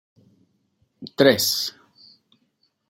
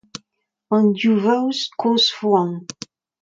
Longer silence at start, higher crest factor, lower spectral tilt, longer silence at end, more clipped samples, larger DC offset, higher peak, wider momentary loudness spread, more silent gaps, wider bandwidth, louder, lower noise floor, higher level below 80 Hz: first, 1 s vs 0.15 s; first, 24 dB vs 16 dB; second, -3 dB/octave vs -5 dB/octave; first, 1.2 s vs 0.6 s; neither; neither; about the same, -2 dBFS vs -4 dBFS; about the same, 22 LU vs 21 LU; neither; first, 16 kHz vs 7.6 kHz; about the same, -19 LUFS vs -18 LUFS; about the same, -69 dBFS vs -72 dBFS; about the same, -68 dBFS vs -70 dBFS